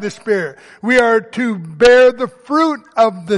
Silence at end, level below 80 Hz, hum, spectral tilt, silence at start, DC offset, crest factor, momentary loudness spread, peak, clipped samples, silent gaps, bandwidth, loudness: 0 s; -48 dBFS; none; -5 dB/octave; 0 s; under 0.1%; 14 dB; 12 LU; 0 dBFS; under 0.1%; none; 11.5 kHz; -14 LUFS